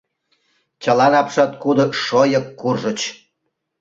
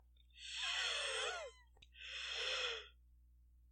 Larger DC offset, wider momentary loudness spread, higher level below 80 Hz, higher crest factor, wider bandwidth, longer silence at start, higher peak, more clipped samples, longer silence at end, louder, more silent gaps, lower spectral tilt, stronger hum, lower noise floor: neither; second, 10 LU vs 16 LU; first, -62 dBFS vs -68 dBFS; about the same, 18 dB vs 18 dB; second, 7.8 kHz vs 16.5 kHz; first, 0.8 s vs 0.05 s; first, -2 dBFS vs -28 dBFS; neither; first, 0.65 s vs 0 s; first, -17 LUFS vs -41 LUFS; neither; first, -5 dB/octave vs 1.5 dB/octave; second, none vs 60 Hz at -70 dBFS; first, -74 dBFS vs -67 dBFS